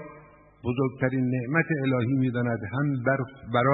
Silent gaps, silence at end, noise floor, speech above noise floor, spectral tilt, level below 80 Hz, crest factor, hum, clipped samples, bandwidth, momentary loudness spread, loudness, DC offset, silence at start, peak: none; 0 s; -52 dBFS; 26 dB; -12 dB/octave; -60 dBFS; 18 dB; none; under 0.1%; 4 kHz; 5 LU; -27 LUFS; under 0.1%; 0 s; -8 dBFS